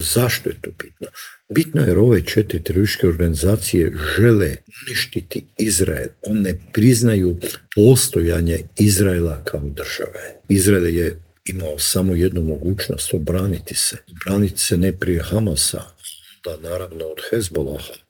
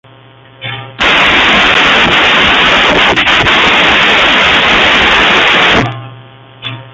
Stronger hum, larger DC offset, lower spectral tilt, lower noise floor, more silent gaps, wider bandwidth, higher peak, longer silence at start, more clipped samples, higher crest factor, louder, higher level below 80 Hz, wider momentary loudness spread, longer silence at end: neither; neither; first, -5 dB/octave vs -3 dB/octave; about the same, -39 dBFS vs -38 dBFS; neither; first, over 20 kHz vs 16 kHz; about the same, 0 dBFS vs 0 dBFS; second, 0 s vs 0.6 s; second, under 0.1% vs 0.1%; first, 18 dB vs 8 dB; second, -18 LUFS vs -5 LUFS; second, -38 dBFS vs -32 dBFS; about the same, 15 LU vs 16 LU; about the same, 0.1 s vs 0.05 s